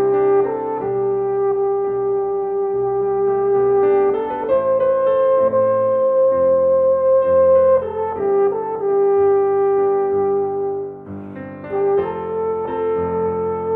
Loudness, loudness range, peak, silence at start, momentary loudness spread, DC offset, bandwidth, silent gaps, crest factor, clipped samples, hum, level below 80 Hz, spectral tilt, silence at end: -17 LUFS; 5 LU; -6 dBFS; 0 s; 7 LU; under 0.1%; 3.3 kHz; none; 10 dB; under 0.1%; none; -54 dBFS; -10.5 dB/octave; 0 s